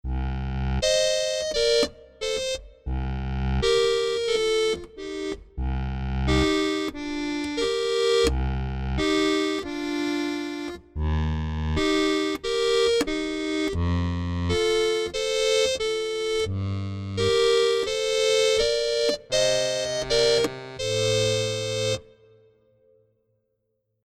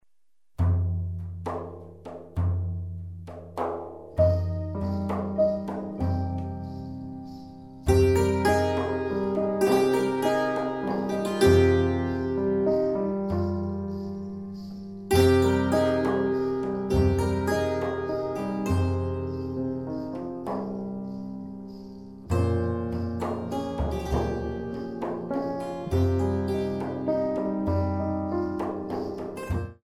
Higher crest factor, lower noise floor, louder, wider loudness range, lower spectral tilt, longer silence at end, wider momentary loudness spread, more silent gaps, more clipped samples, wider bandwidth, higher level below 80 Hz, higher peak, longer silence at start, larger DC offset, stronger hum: about the same, 16 dB vs 18 dB; second, -75 dBFS vs -85 dBFS; about the same, -25 LUFS vs -27 LUFS; second, 4 LU vs 7 LU; second, -4 dB/octave vs -7.5 dB/octave; first, 2 s vs 0.1 s; second, 9 LU vs 15 LU; neither; neither; about the same, 15 kHz vs 15.5 kHz; first, -36 dBFS vs -42 dBFS; about the same, -10 dBFS vs -8 dBFS; second, 0.05 s vs 0.6 s; second, under 0.1% vs 0.1%; neither